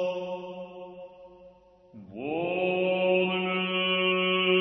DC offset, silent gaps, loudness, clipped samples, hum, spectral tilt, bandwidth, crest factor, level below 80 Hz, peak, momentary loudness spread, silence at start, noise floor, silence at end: under 0.1%; none; -26 LUFS; under 0.1%; none; -7 dB/octave; 6 kHz; 16 dB; -70 dBFS; -12 dBFS; 20 LU; 0 s; -55 dBFS; 0 s